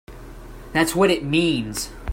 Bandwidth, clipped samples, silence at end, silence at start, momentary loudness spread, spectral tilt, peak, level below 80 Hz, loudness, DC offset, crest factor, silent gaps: 16.5 kHz; under 0.1%; 0 s; 0.1 s; 23 LU; -4.5 dB/octave; -6 dBFS; -42 dBFS; -21 LUFS; under 0.1%; 18 dB; none